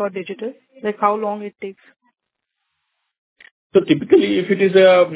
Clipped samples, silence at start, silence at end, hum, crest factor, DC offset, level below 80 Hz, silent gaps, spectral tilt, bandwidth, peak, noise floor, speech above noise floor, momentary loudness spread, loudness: under 0.1%; 0 s; 0 s; none; 18 dB; under 0.1%; -62 dBFS; 3.18-3.36 s, 3.51-3.70 s; -10 dB/octave; 4 kHz; -2 dBFS; -78 dBFS; 61 dB; 19 LU; -16 LUFS